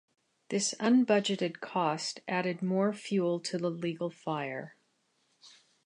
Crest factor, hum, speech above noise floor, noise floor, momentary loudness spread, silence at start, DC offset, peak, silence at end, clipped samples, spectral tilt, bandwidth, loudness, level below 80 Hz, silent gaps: 18 dB; none; 44 dB; -74 dBFS; 10 LU; 0.5 s; under 0.1%; -14 dBFS; 0.35 s; under 0.1%; -4.5 dB/octave; 11 kHz; -31 LUFS; -82 dBFS; none